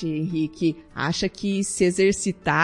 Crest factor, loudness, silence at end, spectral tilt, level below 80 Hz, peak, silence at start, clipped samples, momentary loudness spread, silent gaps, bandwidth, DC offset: 18 dB; -24 LUFS; 0 s; -4.5 dB/octave; -50 dBFS; -6 dBFS; 0 s; under 0.1%; 7 LU; none; 11.5 kHz; under 0.1%